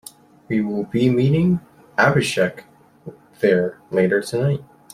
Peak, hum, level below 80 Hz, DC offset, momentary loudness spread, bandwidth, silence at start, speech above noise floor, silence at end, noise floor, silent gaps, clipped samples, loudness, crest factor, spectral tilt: -2 dBFS; none; -54 dBFS; under 0.1%; 7 LU; 15.5 kHz; 0.5 s; 22 dB; 0.3 s; -41 dBFS; none; under 0.1%; -20 LUFS; 18 dB; -6.5 dB/octave